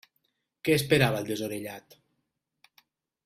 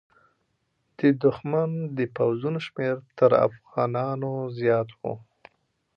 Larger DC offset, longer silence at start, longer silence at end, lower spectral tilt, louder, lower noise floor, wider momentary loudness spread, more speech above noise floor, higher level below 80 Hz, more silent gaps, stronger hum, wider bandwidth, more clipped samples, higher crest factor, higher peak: neither; second, 0.65 s vs 1 s; first, 1.45 s vs 0.75 s; second, -5 dB/octave vs -9.5 dB/octave; about the same, -27 LUFS vs -25 LUFS; first, -81 dBFS vs -73 dBFS; first, 17 LU vs 9 LU; first, 54 dB vs 49 dB; about the same, -62 dBFS vs -66 dBFS; neither; neither; first, 16 kHz vs 6.6 kHz; neither; about the same, 22 dB vs 20 dB; about the same, -8 dBFS vs -6 dBFS